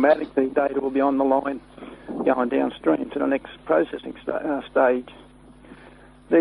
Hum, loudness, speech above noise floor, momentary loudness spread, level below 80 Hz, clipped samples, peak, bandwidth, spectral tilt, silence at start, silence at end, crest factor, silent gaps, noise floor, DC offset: none; -23 LUFS; 26 dB; 12 LU; -56 dBFS; under 0.1%; -6 dBFS; 11 kHz; -7.5 dB/octave; 0 s; 0 s; 18 dB; none; -48 dBFS; under 0.1%